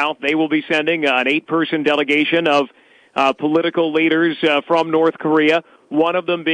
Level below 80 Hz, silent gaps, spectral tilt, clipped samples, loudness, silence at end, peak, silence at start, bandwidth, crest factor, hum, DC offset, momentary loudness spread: -68 dBFS; none; -5.5 dB/octave; under 0.1%; -17 LUFS; 0 s; -4 dBFS; 0 s; 9.6 kHz; 12 dB; none; under 0.1%; 4 LU